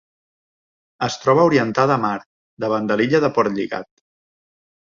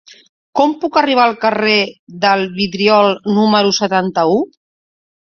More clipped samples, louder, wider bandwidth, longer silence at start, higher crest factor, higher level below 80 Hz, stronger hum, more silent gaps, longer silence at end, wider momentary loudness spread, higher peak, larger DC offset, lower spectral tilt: neither; second, -19 LUFS vs -14 LUFS; about the same, 7.4 kHz vs 7 kHz; first, 1 s vs 0.55 s; about the same, 18 dB vs 14 dB; about the same, -60 dBFS vs -58 dBFS; neither; first, 2.26-2.57 s vs 1.99-2.07 s; first, 1.1 s vs 0.9 s; first, 12 LU vs 6 LU; about the same, -2 dBFS vs 0 dBFS; neither; first, -6 dB/octave vs -4.5 dB/octave